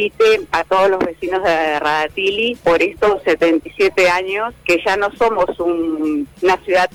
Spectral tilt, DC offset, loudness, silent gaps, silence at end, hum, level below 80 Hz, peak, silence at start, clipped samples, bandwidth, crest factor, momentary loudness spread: -4 dB/octave; under 0.1%; -16 LUFS; none; 0.05 s; none; -46 dBFS; -8 dBFS; 0 s; under 0.1%; 18.5 kHz; 8 dB; 5 LU